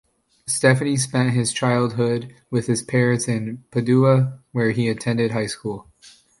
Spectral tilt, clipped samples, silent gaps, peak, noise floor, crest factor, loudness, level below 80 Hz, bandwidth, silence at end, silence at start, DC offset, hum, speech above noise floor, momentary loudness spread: -5.5 dB/octave; under 0.1%; none; -2 dBFS; -51 dBFS; 18 dB; -21 LUFS; -58 dBFS; 11.5 kHz; 0.3 s; 0.45 s; under 0.1%; none; 31 dB; 9 LU